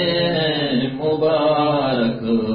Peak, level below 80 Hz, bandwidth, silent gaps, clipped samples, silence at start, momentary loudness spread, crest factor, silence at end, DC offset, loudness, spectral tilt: -8 dBFS; -52 dBFS; 5.2 kHz; none; under 0.1%; 0 s; 4 LU; 10 dB; 0 s; under 0.1%; -19 LUFS; -11 dB/octave